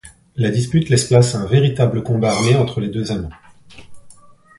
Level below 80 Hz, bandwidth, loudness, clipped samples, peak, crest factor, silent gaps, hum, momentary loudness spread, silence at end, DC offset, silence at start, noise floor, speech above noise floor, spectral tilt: -42 dBFS; 11.5 kHz; -17 LUFS; under 0.1%; 0 dBFS; 18 dB; none; none; 10 LU; 0.5 s; under 0.1%; 0.05 s; -44 dBFS; 29 dB; -6 dB/octave